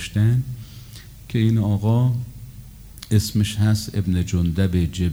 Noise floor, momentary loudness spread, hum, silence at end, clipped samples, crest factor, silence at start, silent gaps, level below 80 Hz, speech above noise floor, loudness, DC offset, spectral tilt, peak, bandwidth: -40 dBFS; 20 LU; none; 0 s; under 0.1%; 16 dB; 0 s; none; -42 dBFS; 21 dB; -21 LUFS; under 0.1%; -6.5 dB/octave; -4 dBFS; over 20 kHz